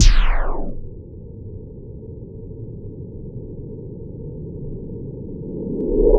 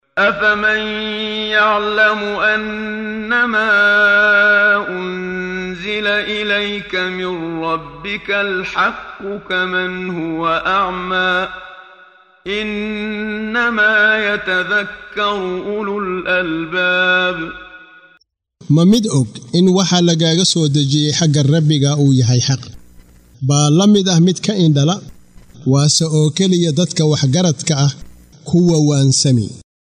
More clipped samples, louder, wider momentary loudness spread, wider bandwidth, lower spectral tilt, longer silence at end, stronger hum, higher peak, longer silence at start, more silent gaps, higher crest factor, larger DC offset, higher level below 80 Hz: neither; second, -29 LUFS vs -15 LUFS; first, 14 LU vs 11 LU; second, 7 kHz vs 10.5 kHz; about the same, -5.5 dB/octave vs -4.5 dB/octave; second, 0 s vs 0.3 s; neither; about the same, 0 dBFS vs -2 dBFS; second, 0 s vs 0.15 s; neither; first, 20 dB vs 14 dB; neither; first, -22 dBFS vs -48 dBFS